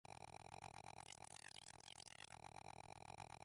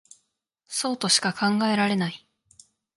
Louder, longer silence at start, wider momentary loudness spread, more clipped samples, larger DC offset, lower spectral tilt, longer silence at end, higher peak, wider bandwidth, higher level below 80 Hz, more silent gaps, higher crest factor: second, -59 LUFS vs -24 LUFS; second, 0.05 s vs 0.7 s; second, 1 LU vs 11 LU; neither; neither; about the same, -2.5 dB/octave vs -3 dB/octave; second, 0 s vs 0.8 s; second, -42 dBFS vs -6 dBFS; about the same, 11.5 kHz vs 11.5 kHz; second, -78 dBFS vs -72 dBFS; neither; about the same, 18 dB vs 22 dB